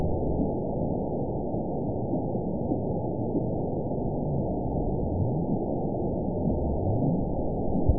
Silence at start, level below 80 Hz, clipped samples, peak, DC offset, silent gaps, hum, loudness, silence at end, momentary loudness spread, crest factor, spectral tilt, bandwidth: 0 s; -38 dBFS; under 0.1%; -10 dBFS; 1%; none; none; -29 LUFS; 0 s; 3 LU; 18 dB; -19 dB/octave; 1 kHz